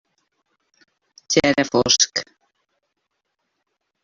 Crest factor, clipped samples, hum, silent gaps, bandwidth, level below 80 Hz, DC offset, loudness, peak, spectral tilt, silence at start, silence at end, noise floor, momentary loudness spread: 22 dB; under 0.1%; none; none; 7.8 kHz; -56 dBFS; under 0.1%; -18 LUFS; -2 dBFS; -2 dB/octave; 1.3 s; 1.8 s; -76 dBFS; 5 LU